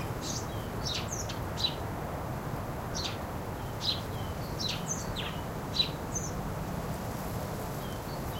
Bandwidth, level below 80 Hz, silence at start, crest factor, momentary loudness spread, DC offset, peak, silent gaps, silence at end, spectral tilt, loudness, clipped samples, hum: 16 kHz; -46 dBFS; 0 s; 20 dB; 6 LU; under 0.1%; -16 dBFS; none; 0 s; -4 dB/octave; -34 LUFS; under 0.1%; none